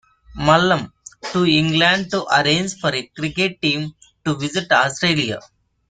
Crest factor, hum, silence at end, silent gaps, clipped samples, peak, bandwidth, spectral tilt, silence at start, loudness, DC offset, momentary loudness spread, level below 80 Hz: 18 dB; none; 0.5 s; none; under 0.1%; -2 dBFS; 9.6 kHz; -4.5 dB/octave; 0.3 s; -18 LUFS; under 0.1%; 10 LU; -48 dBFS